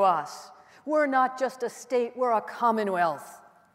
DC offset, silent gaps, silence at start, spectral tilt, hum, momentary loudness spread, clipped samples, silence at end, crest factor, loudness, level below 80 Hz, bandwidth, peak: under 0.1%; none; 0 s; -4.5 dB/octave; none; 16 LU; under 0.1%; 0.4 s; 16 dB; -27 LUFS; -84 dBFS; 16 kHz; -10 dBFS